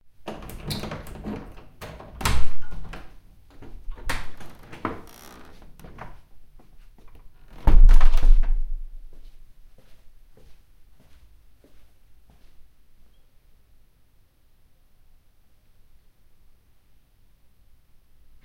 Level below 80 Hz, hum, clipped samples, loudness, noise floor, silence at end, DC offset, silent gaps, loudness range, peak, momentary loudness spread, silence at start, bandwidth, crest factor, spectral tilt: -24 dBFS; none; under 0.1%; -28 LUFS; -57 dBFS; 9.45 s; under 0.1%; none; 13 LU; -2 dBFS; 26 LU; 0.25 s; 10 kHz; 18 dB; -5 dB/octave